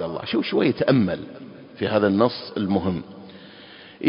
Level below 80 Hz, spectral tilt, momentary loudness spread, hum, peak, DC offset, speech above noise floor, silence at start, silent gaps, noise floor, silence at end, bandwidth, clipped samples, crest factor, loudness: -52 dBFS; -11 dB/octave; 23 LU; none; -4 dBFS; under 0.1%; 23 dB; 0 s; none; -45 dBFS; 0 s; 5.4 kHz; under 0.1%; 20 dB; -22 LUFS